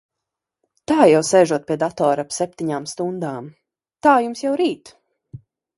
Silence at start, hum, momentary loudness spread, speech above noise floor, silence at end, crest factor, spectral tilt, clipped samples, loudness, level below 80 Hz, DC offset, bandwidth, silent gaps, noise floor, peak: 0.9 s; none; 14 LU; 65 dB; 0.4 s; 20 dB; -5 dB/octave; under 0.1%; -19 LUFS; -62 dBFS; under 0.1%; 11.5 kHz; none; -83 dBFS; 0 dBFS